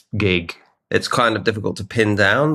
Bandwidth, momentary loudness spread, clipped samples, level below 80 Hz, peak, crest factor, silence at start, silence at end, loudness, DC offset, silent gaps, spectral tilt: 13.5 kHz; 8 LU; under 0.1%; -52 dBFS; -2 dBFS; 18 dB; 0.15 s; 0 s; -19 LUFS; under 0.1%; none; -5.5 dB/octave